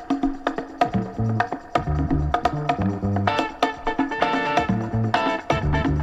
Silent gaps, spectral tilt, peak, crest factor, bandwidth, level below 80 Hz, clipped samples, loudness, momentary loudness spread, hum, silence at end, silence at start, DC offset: none; -7 dB/octave; -4 dBFS; 18 dB; 11.5 kHz; -34 dBFS; under 0.1%; -23 LUFS; 4 LU; none; 0 s; 0 s; under 0.1%